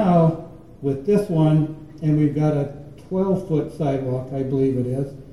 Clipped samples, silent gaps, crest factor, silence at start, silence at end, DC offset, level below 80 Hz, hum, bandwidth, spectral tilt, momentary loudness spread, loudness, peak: under 0.1%; none; 14 dB; 0 s; 0 s; 0.4%; -48 dBFS; none; 11.5 kHz; -9.5 dB/octave; 10 LU; -22 LUFS; -6 dBFS